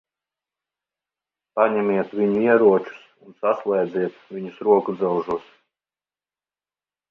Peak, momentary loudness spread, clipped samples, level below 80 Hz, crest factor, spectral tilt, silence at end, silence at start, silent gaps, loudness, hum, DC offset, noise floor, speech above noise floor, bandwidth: -2 dBFS; 14 LU; under 0.1%; -68 dBFS; 20 dB; -9 dB/octave; 1.7 s; 1.55 s; none; -21 LUFS; 50 Hz at -55 dBFS; under 0.1%; under -90 dBFS; over 70 dB; 5.2 kHz